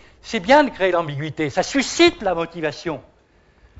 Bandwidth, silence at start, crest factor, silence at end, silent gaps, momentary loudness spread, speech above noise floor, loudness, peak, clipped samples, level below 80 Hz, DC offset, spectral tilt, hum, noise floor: 8 kHz; 0.25 s; 18 dB; 0.8 s; none; 13 LU; 37 dB; -19 LUFS; -2 dBFS; under 0.1%; -50 dBFS; under 0.1%; -4 dB/octave; none; -56 dBFS